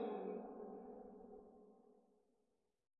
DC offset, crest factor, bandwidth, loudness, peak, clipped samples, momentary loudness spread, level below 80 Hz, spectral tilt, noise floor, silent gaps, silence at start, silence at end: under 0.1%; 18 dB; 4 kHz; -52 LUFS; -34 dBFS; under 0.1%; 18 LU; -84 dBFS; -7 dB/octave; -86 dBFS; none; 0 s; 0.85 s